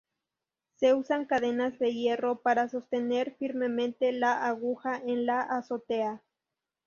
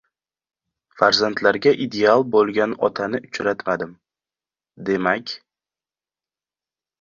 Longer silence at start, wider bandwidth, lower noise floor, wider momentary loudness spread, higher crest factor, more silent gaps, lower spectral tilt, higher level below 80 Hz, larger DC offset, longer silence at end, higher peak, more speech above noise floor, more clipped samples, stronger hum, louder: second, 0.8 s vs 0.95 s; about the same, 7 kHz vs 7.4 kHz; about the same, -89 dBFS vs under -90 dBFS; second, 6 LU vs 10 LU; about the same, 18 dB vs 22 dB; neither; about the same, -5 dB/octave vs -4.5 dB/octave; second, -76 dBFS vs -62 dBFS; neither; second, 0.7 s vs 1.65 s; second, -12 dBFS vs 0 dBFS; second, 60 dB vs over 71 dB; neither; neither; second, -29 LUFS vs -20 LUFS